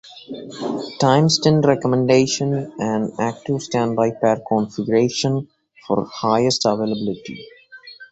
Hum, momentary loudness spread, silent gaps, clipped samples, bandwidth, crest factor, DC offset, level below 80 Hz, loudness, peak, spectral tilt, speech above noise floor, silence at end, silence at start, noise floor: none; 15 LU; none; under 0.1%; 8.2 kHz; 20 dB; under 0.1%; -56 dBFS; -19 LUFS; 0 dBFS; -5.5 dB/octave; 24 dB; 0.05 s; 0.05 s; -43 dBFS